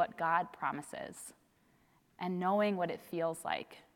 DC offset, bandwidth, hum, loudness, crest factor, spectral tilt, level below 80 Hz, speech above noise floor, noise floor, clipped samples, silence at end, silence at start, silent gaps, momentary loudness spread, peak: under 0.1%; 17.5 kHz; none; -36 LUFS; 20 dB; -5 dB/octave; -78 dBFS; 34 dB; -70 dBFS; under 0.1%; 0.15 s; 0 s; none; 14 LU; -18 dBFS